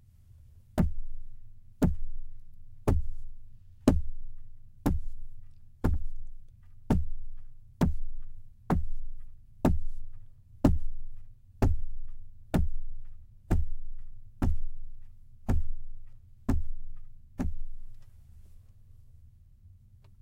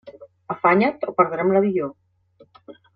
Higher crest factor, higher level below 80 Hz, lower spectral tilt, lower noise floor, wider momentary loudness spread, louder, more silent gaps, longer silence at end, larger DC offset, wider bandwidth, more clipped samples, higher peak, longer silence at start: about the same, 22 dB vs 20 dB; first, -34 dBFS vs -66 dBFS; second, -8 dB/octave vs -9.5 dB/octave; about the same, -55 dBFS vs -56 dBFS; first, 23 LU vs 11 LU; second, -33 LUFS vs -20 LUFS; neither; first, 0.55 s vs 0.25 s; neither; first, 8 kHz vs 5.2 kHz; neither; second, -8 dBFS vs -2 dBFS; first, 0.55 s vs 0.05 s